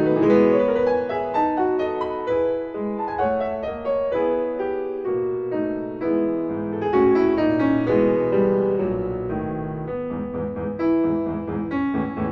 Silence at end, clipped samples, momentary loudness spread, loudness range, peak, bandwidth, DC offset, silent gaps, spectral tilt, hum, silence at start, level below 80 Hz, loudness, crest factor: 0 s; under 0.1%; 9 LU; 4 LU; -6 dBFS; 5.8 kHz; under 0.1%; none; -9.5 dB/octave; none; 0 s; -48 dBFS; -22 LUFS; 16 dB